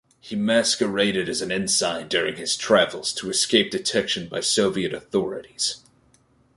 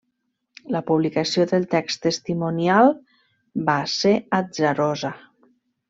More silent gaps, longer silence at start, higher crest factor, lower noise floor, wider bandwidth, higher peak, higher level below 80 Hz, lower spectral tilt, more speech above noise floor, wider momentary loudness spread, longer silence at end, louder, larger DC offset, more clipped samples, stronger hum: neither; second, 0.25 s vs 0.7 s; about the same, 20 dB vs 18 dB; second, -60 dBFS vs -75 dBFS; first, 11.5 kHz vs 8 kHz; about the same, -4 dBFS vs -4 dBFS; about the same, -60 dBFS vs -64 dBFS; second, -2.5 dB/octave vs -5.5 dB/octave; second, 37 dB vs 54 dB; second, 7 LU vs 11 LU; about the same, 0.8 s vs 0.75 s; about the same, -22 LUFS vs -21 LUFS; neither; neither; neither